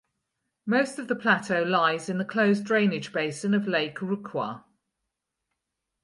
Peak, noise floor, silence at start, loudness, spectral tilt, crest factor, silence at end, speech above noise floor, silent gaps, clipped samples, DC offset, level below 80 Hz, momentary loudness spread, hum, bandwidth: -10 dBFS; -83 dBFS; 0.65 s; -26 LUFS; -5.5 dB/octave; 18 dB; 1.45 s; 58 dB; none; under 0.1%; under 0.1%; -74 dBFS; 9 LU; none; 11.5 kHz